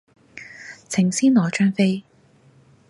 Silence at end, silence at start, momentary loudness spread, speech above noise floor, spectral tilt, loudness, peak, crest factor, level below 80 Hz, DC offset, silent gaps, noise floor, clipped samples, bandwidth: 0.9 s; 0.35 s; 22 LU; 36 dB; -5.5 dB/octave; -20 LUFS; -6 dBFS; 16 dB; -66 dBFS; under 0.1%; none; -55 dBFS; under 0.1%; 11.5 kHz